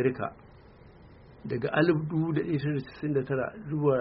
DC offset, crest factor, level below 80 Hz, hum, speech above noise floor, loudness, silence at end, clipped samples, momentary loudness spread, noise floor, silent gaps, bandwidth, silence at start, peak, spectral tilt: under 0.1%; 18 dB; -58 dBFS; none; 24 dB; -29 LUFS; 0 s; under 0.1%; 11 LU; -53 dBFS; none; 5.6 kHz; 0 s; -10 dBFS; -7 dB/octave